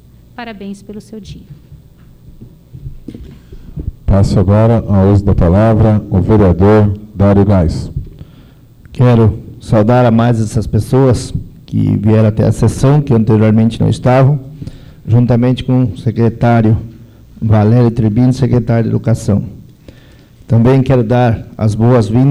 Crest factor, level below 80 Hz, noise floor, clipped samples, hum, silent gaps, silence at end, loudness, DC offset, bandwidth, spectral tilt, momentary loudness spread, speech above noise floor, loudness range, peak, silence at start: 8 dB; -28 dBFS; -40 dBFS; under 0.1%; none; none; 0 s; -11 LUFS; under 0.1%; 11 kHz; -8.5 dB/octave; 20 LU; 30 dB; 4 LU; -2 dBFS; 0.4 s